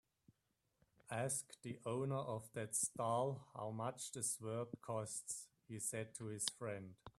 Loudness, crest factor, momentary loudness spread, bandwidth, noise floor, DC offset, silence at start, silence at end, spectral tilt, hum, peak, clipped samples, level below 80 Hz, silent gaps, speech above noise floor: -44 LUFS; 26 dB; 9 LU; 15 kHz; -86 dBFS; under 0.1%; 1.1 s; 0.1 s; -4 dB/octave; none; -18 dBFS; under 0.1%; -80 dBFS; none; 41 dB